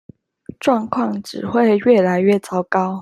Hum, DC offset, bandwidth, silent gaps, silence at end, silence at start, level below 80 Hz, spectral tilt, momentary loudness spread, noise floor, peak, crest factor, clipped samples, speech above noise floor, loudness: none; under 0.1%; 13 kHz; none; 0 s; 0.65 s; -60 dBFS; -7 dB/octave; 8 LU; -39 dBFS; -2 dBFS; 16 dB; under 0.1%; 23 dB; -17 LUFS